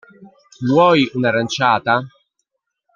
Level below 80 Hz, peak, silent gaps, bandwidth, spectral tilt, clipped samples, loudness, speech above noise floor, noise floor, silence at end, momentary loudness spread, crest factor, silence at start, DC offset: -60 dBFS; -2 dBFS; none; 7.4 kHz; -5.5 dB/octave; under 0.1%; -16 LUFS; 58 dB; -74 dBFS; 0.85 s; 7 LU; 18 dB; 0.2 s; under 0.1%